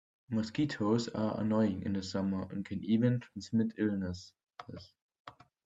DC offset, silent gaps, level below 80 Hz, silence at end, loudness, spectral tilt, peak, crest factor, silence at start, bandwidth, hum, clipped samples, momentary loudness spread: under 0.1%; 5.02-5.09 s, 5.20-5.25 s; -70 dBFS; 0.35 s; -34 LUFS; -7 dB/octave; -16 dBFS; 18 dB; 0.3 s; 7.8 kHz; none; under 0.1%; 19 LU